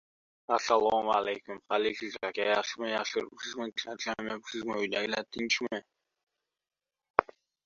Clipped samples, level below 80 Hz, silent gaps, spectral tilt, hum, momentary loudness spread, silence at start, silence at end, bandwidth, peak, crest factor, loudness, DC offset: under 0.1%; -72 dBFS; 6.23-6.27 s, 7.10-7.14 s; -2.5 dB/octave; none; 10 LU; 0.5 s; 0.45 s; 7.6 kHz; -2 dBFS; 30 dB; -32 LUFS; under 0.1%